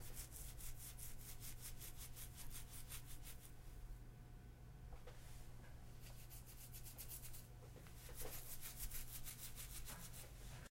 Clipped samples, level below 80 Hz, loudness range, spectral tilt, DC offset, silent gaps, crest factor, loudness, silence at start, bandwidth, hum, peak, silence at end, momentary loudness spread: under 0.1%; -56 dBFS; 6 LU; -3 dB/octave; under 0.1%; none; 18 dB; -55 LUFS; 0 s; 16 kHz; none; -34 dBFS; 0 s; 9 LU